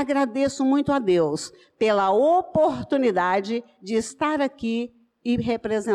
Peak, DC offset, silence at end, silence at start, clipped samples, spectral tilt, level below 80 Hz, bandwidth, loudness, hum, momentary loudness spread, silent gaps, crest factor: -12 dBFS; under 0.1%; 0 s; 0 s; under 0.1%; -5.5 dB/octave; -56 dBFS; 11.5 kHz; -23 LUFS; none; 10 LU; none; 10 dB